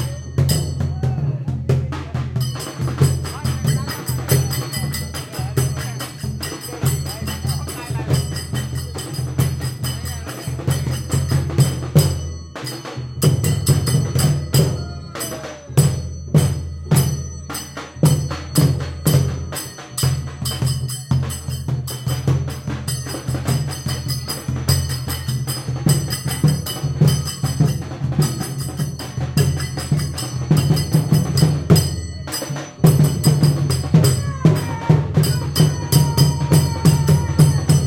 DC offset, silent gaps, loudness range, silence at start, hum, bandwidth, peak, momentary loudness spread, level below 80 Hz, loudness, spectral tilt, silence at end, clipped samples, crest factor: under 0.1%; none; 7 LU; 0 s; none; 17 kHz; -2 dBFS; 11 LU; -36 dBFS; -20 LUFS; -5.5 dB/octave; 0 s; under 0.1%; 16 dB